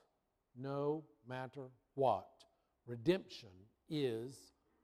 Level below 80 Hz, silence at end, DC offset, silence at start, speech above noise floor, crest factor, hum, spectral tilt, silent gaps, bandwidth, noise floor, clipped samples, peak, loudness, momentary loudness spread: -76 dBFS; 0.4 s; under 0.1%; 0.55 s; 41 dB; 22 dB; none; -7 dB/octave; none; 15 kHz; -82 dBFS; under 0.1%; -20 dBFS; -41 LUFS; 17 LU